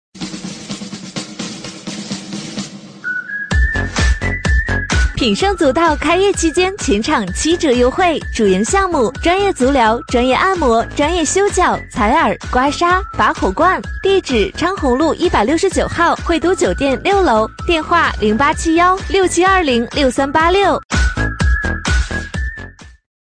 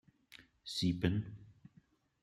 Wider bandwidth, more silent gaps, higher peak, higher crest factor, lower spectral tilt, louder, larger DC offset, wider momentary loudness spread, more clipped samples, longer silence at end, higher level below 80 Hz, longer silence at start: second, 10.5 kHz vs 14 kHz; first, 20.85-20.89 s vs none; first, -2 dBFS vs -18 dBFS; second, 12 dB vs 22 dB; second, -4.5 dB/octave vs -6 dB/octave; first, -15 LUFS vs -37 LUFS; neither; second, 13 LU vs 25 LU; neither; second, 0.4 s vs 0.7 s; first, -24 dBFS vs -64 dBFS; second, 0.15 s vs 0.3 s